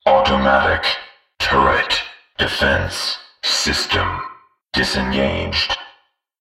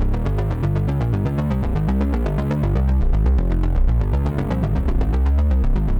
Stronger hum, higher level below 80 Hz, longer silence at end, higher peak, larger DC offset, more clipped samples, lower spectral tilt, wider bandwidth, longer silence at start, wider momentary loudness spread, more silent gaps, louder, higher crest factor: neither; second, -36 dBFS vs -20 dBFS; first, 0.5 s vs 0 s; first, -2 dBFS vs -6 dBFS; neither; neither; second, -3.5 dB/octave vs -9.5 dB/octave; first, 16 kHz vs 5.2 kHz; about the same, 0.05 s vs 0 s; first, 9 LU vs 3 LU; neither; first, -18 LUFS vs -21 LUFS; first, 18 dB vs 10 dB